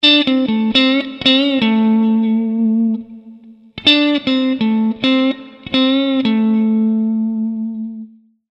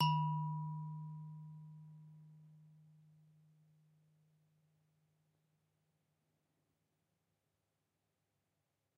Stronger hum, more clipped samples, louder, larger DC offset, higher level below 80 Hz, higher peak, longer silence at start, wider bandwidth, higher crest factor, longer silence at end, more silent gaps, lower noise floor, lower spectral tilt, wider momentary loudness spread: neither; neither; first, -15 LUFS vs -42 LUFS; neither; first, -56 dBFS vs -88 dBFS; first, 0 dBFS vs -20 dBFS; about the same, 0 s vs 0 s; first, 7.8 kHz vs 6.4 kHz; second, 16 dB vs 26 dB; second, 0.45 s vs 6.15 s; neither; second, -40 dBFS vs -87 dBFS; about the same, -6 dB/octave vs -5 dB/octave; second, 10 LU vs 25 LU